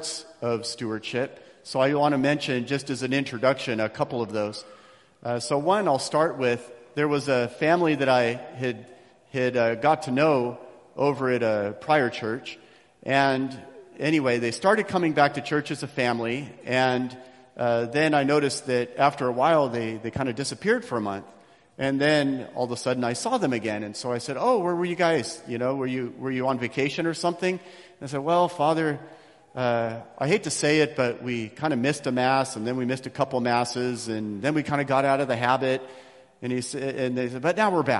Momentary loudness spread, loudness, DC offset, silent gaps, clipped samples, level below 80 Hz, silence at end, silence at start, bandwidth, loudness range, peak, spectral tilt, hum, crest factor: 10 LU; -25 LUFS; under 0.1%; none; under 0.1%; -64 dBFS; 0 s; 0 s; 12 kHz; 3 LU; -4 dBFS; -5 dB/octave; none; 22 dB